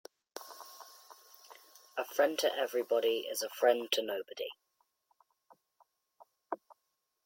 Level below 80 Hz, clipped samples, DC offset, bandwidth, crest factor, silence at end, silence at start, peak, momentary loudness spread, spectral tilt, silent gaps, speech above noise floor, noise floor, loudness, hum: -90 dBFS; under 0.1%; under 0.1%; 17 kHz; 24 dB; 0.7 s; 0.35 s; -14 dBFS; 25 LU; -1 dB/octave; none; 51 dB; -83 dBFS; -34 LUFS; none